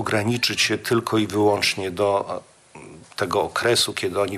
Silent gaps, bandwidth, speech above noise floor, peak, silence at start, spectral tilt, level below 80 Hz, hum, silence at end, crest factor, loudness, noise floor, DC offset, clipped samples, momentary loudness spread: none; 15.5 kHz; 22 dB; -8 dBFS; 0 s; -3.5 dB/octave; -58 dBFS; none; 0 s; 14 dB; -21 LUFS; -44 dBFS; under 0.1%; under 0.1%; 8 LU